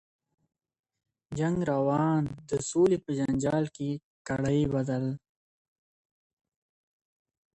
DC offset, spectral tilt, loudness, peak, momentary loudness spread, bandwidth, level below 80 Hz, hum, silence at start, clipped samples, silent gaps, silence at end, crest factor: under 0.1%; -7 dB/octave; -29 LUFS; -14 dBFS; 10 LU; 10.5 kHz; -58 dBFS; none; 1.3 s; under 0.1%; 4.04-4.25 s; 2.4 s; 16 dB